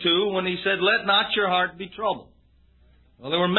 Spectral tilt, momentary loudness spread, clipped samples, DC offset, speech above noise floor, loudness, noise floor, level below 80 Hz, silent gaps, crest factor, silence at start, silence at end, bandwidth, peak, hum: -9 dB/octave; 9 LU; under 0.1%; under 0.1%; 34 dB; -23 LUFS; -58 dBFS; -58 dBFS; none; 20 dB; 0 s; 0 s; 4.3 kHz; -4 dBFS; none